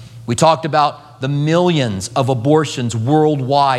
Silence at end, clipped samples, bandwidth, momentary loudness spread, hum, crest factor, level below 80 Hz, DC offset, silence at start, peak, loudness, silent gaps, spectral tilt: 0 s; under 0.1%; 13 kHz; 6 LU; none; 14 dB; -54 dBFS; under 0.1%; 0 s; 0 dBFS; -16 LUFS; none; -6 dB/octave